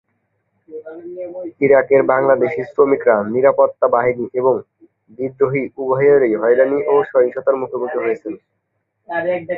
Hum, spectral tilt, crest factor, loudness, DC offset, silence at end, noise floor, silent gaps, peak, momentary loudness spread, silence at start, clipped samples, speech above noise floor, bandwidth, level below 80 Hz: none; -10 dB/octave; 16 dB; -16 LUFS; under 0.1%; 0 s; -68 dBFS; none; 0 dBFS; 16 LU; 0.7 s; under 0.1%; 52 dB; 4 kHz; -60 dBFS